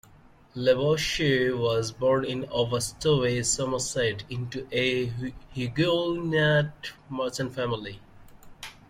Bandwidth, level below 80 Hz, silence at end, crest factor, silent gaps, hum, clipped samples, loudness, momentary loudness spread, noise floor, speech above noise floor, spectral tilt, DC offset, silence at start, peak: 16 kHz; -52 dBFS; 0.2 s; 18 dB; none; none; under 0.1%; -26 LUFS; 11 LU; -54 dBFS; 28 dB; -4.5 dB/octave; under 0.1%; 0.55 s; -10 dBFS